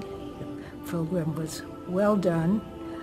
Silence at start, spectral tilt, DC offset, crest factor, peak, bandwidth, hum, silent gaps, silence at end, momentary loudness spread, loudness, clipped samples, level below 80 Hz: 0 s; -7 dB/octave; under 0.1%; 16 dB; -12 dBFS; 16 kHz; none; none; 0 s; 15 LU; -29 LUFS; under 0.1%; -54 dBFS